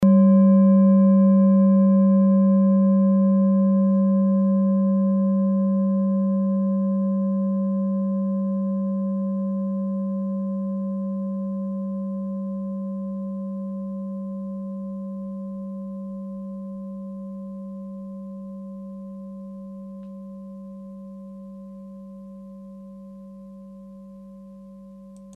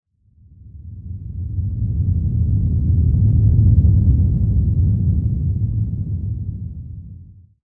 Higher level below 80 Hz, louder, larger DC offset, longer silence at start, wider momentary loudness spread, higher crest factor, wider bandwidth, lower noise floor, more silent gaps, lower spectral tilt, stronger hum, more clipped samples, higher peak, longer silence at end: second, -64 dBFS vs -24 dBFS; second, -21 LUFS vs -18 LUFS; neither; second, 0 s vs 0.65 s; first, 24 LU vs 19 LU; about the same, 14 dB vs 14 dB; first, 1.7 kHz vs 0.9 kHz; second, -43 dBFS vs -51 dBFS; neither; second, -13 dB/octave vs -14.5 dB/octave; first, 50 Hz at -65 dBFS vs none; neither; second, -8 dBFS vs -2 dBFS; second, 0 s vs 0.4 s